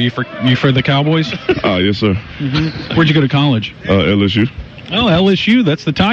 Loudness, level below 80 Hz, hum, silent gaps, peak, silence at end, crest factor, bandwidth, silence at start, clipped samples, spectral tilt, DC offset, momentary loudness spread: -14 LUFS; -38 dBFS; none; none; -2 dBFS; 0 s; 10 dB; 7.4 kHz; 0 s; under 0.1%; -7 dB/octave; under 0.1%; 6 LU